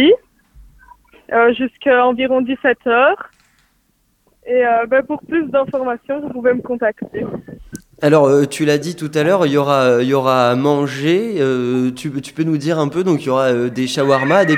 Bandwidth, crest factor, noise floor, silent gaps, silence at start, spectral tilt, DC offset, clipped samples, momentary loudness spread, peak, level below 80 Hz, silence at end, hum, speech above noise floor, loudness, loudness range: 15.5 kHz; 16 dB; -61 dBFS; none; 0 s; -6 dB/octave; under 0.1%; under 0.1%; 10 LU; 0 dBFS; -54 dBFS; 0 s; none; 46 dB; -16 LUFS; 4 LU